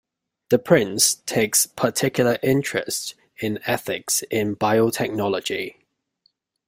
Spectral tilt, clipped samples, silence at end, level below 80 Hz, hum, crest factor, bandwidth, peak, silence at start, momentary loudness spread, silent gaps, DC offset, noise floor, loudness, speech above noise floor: -3.5 dB/octave; under 0.1%; 0.95 s; -60 dBFS; none; 20 dB; 16 kHz; -2 dBFS; 0.5 s; 9 LU; none; under 0.1%; -68 dBFS; -21 LUFS; 46 dB